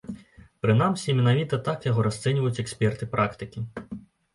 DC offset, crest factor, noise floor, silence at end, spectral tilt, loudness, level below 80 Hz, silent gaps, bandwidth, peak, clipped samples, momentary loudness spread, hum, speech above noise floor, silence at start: under 0.1%; 16 dB; -49 dBFS; 0.35 s; -6.5 dB/octave; -25 LUFS; -54 dBFS; none; 11.5 kHz; -8 dBFS; under 0.1%; 17 LU; none; 25 dB; 0.05 s